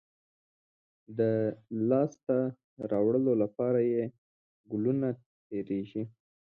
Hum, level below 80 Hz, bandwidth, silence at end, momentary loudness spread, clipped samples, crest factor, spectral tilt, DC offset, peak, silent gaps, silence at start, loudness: none; -74 dBFS; 6.8 kHz; 0.4 s; 12 LU; under 0.1%; 18 dB; -10 dB/octave; under 0.1%; -14 dBFS; 2.23-2.27 s, 2.64-2.77 s, 4.18-4.64 s, 5.26-5.50 s; 1.1 s; -31 LUFS